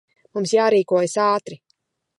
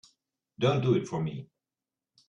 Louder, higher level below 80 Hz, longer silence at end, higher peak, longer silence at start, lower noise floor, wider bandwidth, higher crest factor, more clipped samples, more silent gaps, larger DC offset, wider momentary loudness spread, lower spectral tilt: first, -19 LUFS vs -29 LUFS; second, -76 dBFS vs -66 dBFS; second, 0.65 s vs 0.85 s; first, -6 dBFS vs -12 dBFS; second, 0.35 s vs 0.6 s; second, -69 dBFS vs under -90 dBFS; first, 11.5 kHz vs 8 kHz; about the same, 16 dB vs 20 dB; neither; neither; neither; first, 13 LU vs 10 LU; second, -4.5 dB/octave vs -7 dB/octave